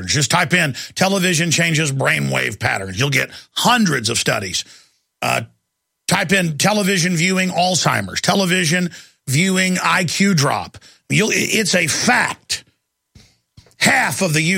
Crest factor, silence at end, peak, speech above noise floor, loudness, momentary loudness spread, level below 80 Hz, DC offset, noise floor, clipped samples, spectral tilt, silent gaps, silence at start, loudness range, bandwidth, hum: 18 dB; 0 s; 0 dBFS; 57 dB; -16 LUFS; 8 LU; -54 dBFS; under 0.1%; -74 dBFS; under 0.1%; -3.5 dB/octave; none; 0 s; 2 LU; 16.5 kHz; none